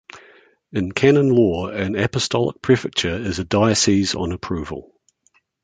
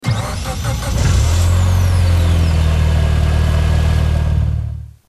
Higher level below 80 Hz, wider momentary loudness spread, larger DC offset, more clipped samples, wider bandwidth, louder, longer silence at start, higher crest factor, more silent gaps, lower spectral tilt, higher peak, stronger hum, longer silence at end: second, -42 dBFS vs -18 dBFS; first, 12 LU vs 6 LU; neither; neither; second, 9.6 kHz vs 13.5 kHz; second, -19 LUFS vs -16 LUFS; about the same, 0.15 s vs 0.05 s; first, 18 dB vs 10 dB; neither; about the same, -5 dB/octave vs -6 dB/octave; about the same, -2 dBFS vs -4 dBFS; neither; first, 0.8 s vs 0.2 s